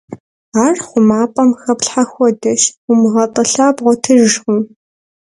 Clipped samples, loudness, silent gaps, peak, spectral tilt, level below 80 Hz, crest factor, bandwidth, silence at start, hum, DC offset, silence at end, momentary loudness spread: under 0.1%; -13 LUFS; 0.20-0.52 s, 2.77-2.88 s; 0 dBFS; -4 dB/octave; -58 dBFS; 12 dB; 11.5 kHz; 0.1 s; none; under 0.1%; 0.55 s; 6 LU